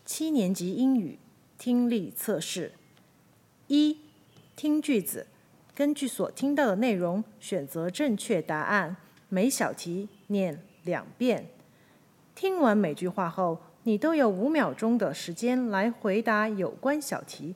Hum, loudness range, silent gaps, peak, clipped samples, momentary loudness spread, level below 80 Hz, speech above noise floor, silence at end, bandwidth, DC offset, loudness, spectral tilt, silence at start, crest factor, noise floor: none; 4 LU; none; -10 dBFS; under 0.1%; 10 LU; -80 dBFS; 34 dB; 0 s; 16.5 kHz; under 0.1%; -28 LUFS; -5 dB/octave; 0.05 s; 18 dB; -61 dBFS